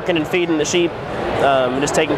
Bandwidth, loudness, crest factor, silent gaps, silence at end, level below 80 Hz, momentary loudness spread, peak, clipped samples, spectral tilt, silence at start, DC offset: 14.5 kHz; -18 LUFS; 14 dB; none; 0 s; -44 dBFS; 6 LU; -4 dBFS; under 0.1%; -4 dB/octave; 0 s; under 0.1%